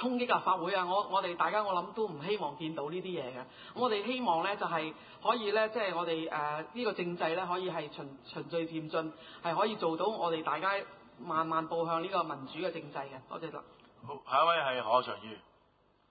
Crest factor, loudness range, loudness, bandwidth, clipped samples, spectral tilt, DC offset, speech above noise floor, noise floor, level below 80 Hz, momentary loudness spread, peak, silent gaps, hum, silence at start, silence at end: 20 dB; 3 LU; -33 LUFS; 4.9 kHz; under 0.1%; -2.5 dB/octave; under 0.1%; 35 dB; -69 dBFS; -76 dBFS; 14 LU; -14 dBFS; none; none; 0 s; 0.7 s